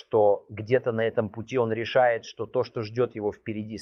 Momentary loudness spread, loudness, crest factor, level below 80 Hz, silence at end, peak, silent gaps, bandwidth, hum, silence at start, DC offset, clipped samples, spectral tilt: 9 LU; -27 LUFS; 18 dB; -66 dBFS; 0 s; -8 dBFS; none; 6.8 kHz; none; 0.1 s; under 0.1%; under 0.1%; -7 dB/octave